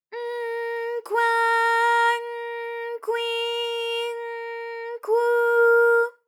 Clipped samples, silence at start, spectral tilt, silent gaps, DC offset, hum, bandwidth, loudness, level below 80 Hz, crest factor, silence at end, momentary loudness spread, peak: under 0.1%; 0.1 s; 2 dB/octave; none; under 0.1%; none; 14.5 kHz; -23 LUFS; under -90 dBFS; 12 dB; 0.15 s; 14 LU; -10 dBFS